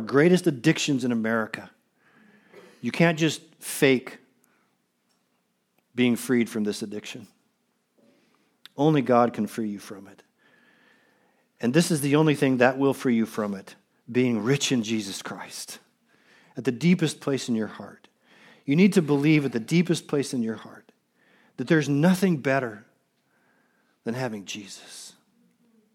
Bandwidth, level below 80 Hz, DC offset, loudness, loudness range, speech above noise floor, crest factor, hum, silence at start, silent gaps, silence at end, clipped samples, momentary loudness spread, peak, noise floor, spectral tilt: 17.5 kHz; -78 dBFS; under 0.1%; -24 LUFS; 5 LU; 49 dB; 22 dB; none; 0 s; none; 0.85 s; under 0.1%; 18 LU; -4 dBFS; -72 dBFS; -5.5 dB/octave